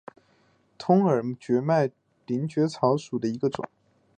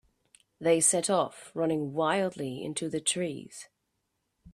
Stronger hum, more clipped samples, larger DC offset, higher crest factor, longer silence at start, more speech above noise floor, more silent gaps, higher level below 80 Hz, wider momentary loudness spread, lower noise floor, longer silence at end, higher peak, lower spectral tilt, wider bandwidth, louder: neither; neither; neither; about the same, 20 dB vs 20 dB; first, 0.8 s vs 0.6 s; second, 40 dB vs 51 dB; neither; about the same, -70 dBFS vs -70 dBFS; about the same, 11 LU vs 13 LU; second, -64 dBFS vs -80 dBFS; first, 0.5 s vs 0.05 s; first, -8 dBFS vs -12 dBFS; first, -7.5 dB/octave vs -3.5 dB/octave; second, 9.4 kHz vs 15 kHz; about the same, -26 LUFS vs -28 LUFS